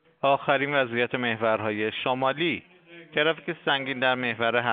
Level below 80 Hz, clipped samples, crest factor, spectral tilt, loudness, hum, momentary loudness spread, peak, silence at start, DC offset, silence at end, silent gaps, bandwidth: -72 dBFS; under 0.1%; 20 dB; -2 dB/octave; -25 LUFS; none; 4 LU; -6 dBFS; 0.25 s; under 0.1%; 0 s; none; 4.7 kHz